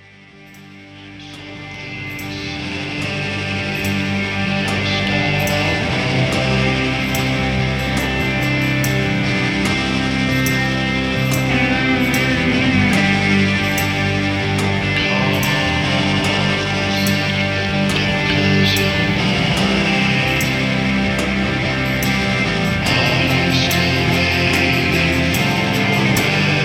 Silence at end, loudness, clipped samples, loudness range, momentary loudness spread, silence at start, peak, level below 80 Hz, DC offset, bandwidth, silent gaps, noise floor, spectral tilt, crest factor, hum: 0 s; -16 LUFS; under 0.1%; 4 LU; 6 LU; 0.35 s; -2 dBFS; -34 dBFS; under 0.1%; 17.5 kHz; none; -42 dBFS; -5 dB/octave; 14 dB; none